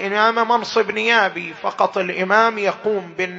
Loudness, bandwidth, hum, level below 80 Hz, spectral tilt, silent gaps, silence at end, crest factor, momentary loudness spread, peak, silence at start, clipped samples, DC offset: -18 LUFS; 8 kHz; none; -70 dBFS; -4 dB/octave; none; 0 s; 18 dB; 8 LU; 0 dBFS; 0 s; under 0.1%; under 0.1%